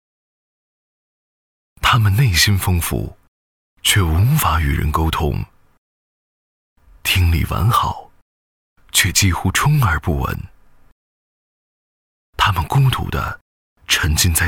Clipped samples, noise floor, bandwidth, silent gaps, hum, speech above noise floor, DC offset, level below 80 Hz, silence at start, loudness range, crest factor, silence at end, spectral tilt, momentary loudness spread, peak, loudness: under 0.1%; under -90 dBFS; 18.5 kHz; 3.28-3.77 s, 5.78-6.76 s, 8.22-8.76 s, 10.92-12.33 s, 13.41-13.76 s; none; over 74 dB; under 0.1%; -30 dBFS; 1.8 s; 5 LU; 18 dB; 0 s; -3.5 dB/octave; 11 LU; 0 dBFS; -17 LUFS